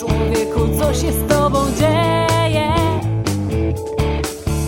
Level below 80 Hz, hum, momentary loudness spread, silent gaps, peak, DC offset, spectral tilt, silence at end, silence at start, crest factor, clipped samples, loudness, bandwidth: -26 dBFS; none; 5 LU; none; -2 dBFS; under 0.1%; -5.5 dB/octave; 0 s; 0 s; 14 dB; under 0.1%; -17 LUFS; 17 kHz